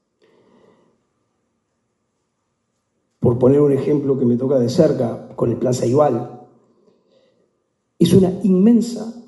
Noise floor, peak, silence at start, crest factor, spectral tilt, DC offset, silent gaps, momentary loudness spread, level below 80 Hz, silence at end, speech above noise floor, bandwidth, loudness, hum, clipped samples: -71 dBFS; 0 dBFS; 3.2 s; 18 dB; -8 dB/octave; under 0.1%; none; 9 LU; -54 dBFS; 0.05 s; 55 dB; 11.5 kHz; -17 LUFS; none; under 0.1%